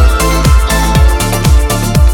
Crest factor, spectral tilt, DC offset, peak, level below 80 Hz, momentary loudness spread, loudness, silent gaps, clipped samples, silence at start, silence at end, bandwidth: 8 dB; -5 dB/octave; under 0.1%; 0 dBFS; -10 dBFS; 2 LU; -10 LUFS; none; 0.3%; 0 s; 0 s; 18 kHz